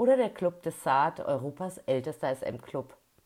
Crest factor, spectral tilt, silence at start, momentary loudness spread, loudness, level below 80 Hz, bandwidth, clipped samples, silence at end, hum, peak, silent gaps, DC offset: 16 dB; -6 dB/octave; 0 s; 12 LU; -31 LUFS; -70 dBFS; 15.5 kHz; under 0.1%; 0.4 s; none; -14 dBFS; none; under 0.1%